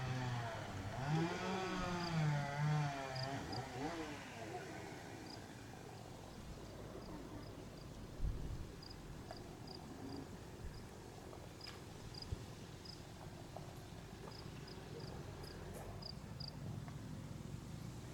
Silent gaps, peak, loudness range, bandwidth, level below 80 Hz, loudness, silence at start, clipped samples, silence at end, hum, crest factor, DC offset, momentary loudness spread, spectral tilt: none; -28 dBFS; 11 LU; 19 kHz; -58 dBFS; -47 LUFS; 0 s; under 0.1%; 0 s; none; 18 dB; under 0.1%; 14 LU; -5.5 dB/octave